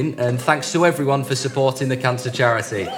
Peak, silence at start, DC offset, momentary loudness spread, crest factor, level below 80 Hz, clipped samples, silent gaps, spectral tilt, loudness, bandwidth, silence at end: 0 dBFS; 0 s; under 0.1%; 4 LU; 20 dB; -62 dBFS; under 0.1%; none; -5 dB/octave; -19 LUFS; 17.5 kHz; 0 s